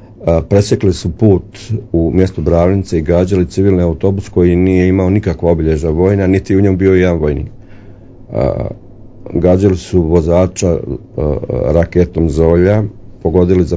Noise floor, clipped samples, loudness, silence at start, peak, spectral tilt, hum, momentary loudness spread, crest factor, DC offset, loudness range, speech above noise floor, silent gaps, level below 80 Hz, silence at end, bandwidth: -34 dBFS; 0.3%; -13 LUFS; 0 s; 0 dBFS; -8 dB/octave; none; 8 LU; 12 dB; under 0.1%; 3 LU; 23 dB; none; -24 dBFS; 0 s; 8 kHz